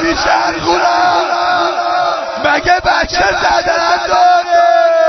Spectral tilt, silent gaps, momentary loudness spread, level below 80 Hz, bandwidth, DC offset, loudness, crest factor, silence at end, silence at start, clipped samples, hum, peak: -3 dB/octave; none; 4 LU; -36 dBFS; 6.4 kHz; under 0.1%; -11 LUFS; 12 dB; 0 s; 0 s; under 0.1%; none; 0 dBFS